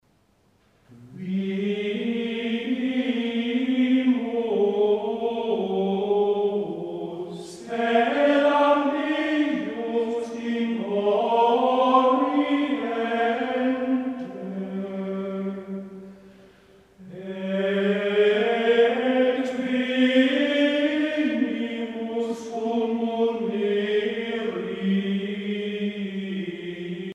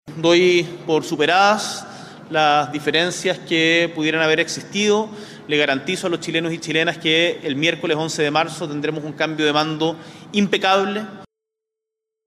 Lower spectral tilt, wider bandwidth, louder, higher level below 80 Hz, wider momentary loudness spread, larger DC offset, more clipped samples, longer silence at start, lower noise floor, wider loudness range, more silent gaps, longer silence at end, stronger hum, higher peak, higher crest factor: first, -6.5 dB/octave vs -4 dB/octave; second, 9.6 kHz vs 14 kHz; second, -24 LUFS vs -19 LUFS; second, -70 dBFS vs -64 dBFS; first, 12 LU vs 9 LU; neither; neither; first, 0.9 s vs 0.05 s; second, -63 dBFS vs -83 dBFS; first, 6 LU vs 3 LU; neither; second, 0 s vs 1 s; neither; about the same, -6 dBFS vs -4 dBFS; about the same, 18 dB vs 16 dB